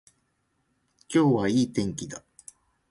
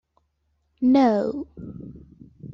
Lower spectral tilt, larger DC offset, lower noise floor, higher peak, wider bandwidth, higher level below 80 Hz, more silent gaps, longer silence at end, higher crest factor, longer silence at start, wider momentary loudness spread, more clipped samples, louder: second, -6 dB/octave vs -8 dB/octave; neither; about the same, -73 dBFS vs -71 dBFS; about the same, -10 dBFS vs -10 dBFS; first, 11.5 kHz vs 6.6 kHz; about the same, -60 dBFS vs -56 dBFS; neither; first, 0.7 s vs 0 s; about the same, 18 dB vs 16 dB; first, 1.1 s vs 0.8 s; second, 17 LU vs 22 LU; neither; second, -25 LUFS vs -21 LUFS